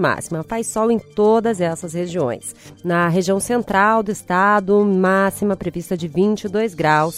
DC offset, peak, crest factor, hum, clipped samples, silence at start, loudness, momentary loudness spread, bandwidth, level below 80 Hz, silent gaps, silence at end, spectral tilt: under 0.1%; -2 dBFS; 16 dB; none; under 0.1%; 0 s; -18 LUFS; 9 LU; 16 kHz; -50 dBFS; none; 0 s; -5.5 dB/octave